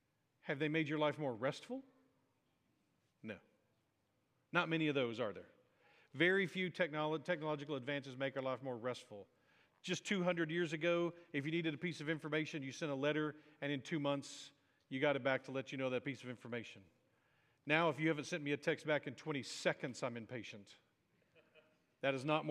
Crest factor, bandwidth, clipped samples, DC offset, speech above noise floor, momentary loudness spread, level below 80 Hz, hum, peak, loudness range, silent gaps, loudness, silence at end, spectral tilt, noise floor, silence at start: 24 dB; 12 kHz; under 0.1%; under 0.1%; 42 dB; 15 LU; under -90 dBFS; none; -18 dBFS; 4 LU; none; -40 LUFS; 0 s; -5.5 dB/octave; -82 dBFS; 0.45 s